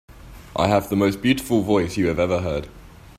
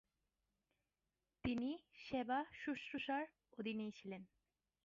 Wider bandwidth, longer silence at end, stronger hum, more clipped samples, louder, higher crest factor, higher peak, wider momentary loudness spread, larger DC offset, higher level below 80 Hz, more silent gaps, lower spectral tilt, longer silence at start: first, 16 kHz vs 7.4 kHz; second, 0.1 s vs 0.6 s; neither; neither; first, -21 LUFS vs -46 LUFS; about the same, 20 dB vs 20 dB; first, -2 dBFS vs -28 dBFS; about the same, 9 LU vs 10 LU; neither; first, -44 dBFS vs -74 dBFS; neither; first, -6 dB/octave vs -3.5 dB/octave; second, 0.1 s vs 1.45 s